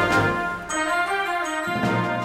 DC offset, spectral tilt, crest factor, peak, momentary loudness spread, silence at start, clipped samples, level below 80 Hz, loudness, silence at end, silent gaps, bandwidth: under 0.1%; -4.5 dB/octave; 16 dB; -6 dBFS; 5 LU; 0 s; under 0.1%; -48 dBFS; -23 LUFS; 0 s; none; 16 kHz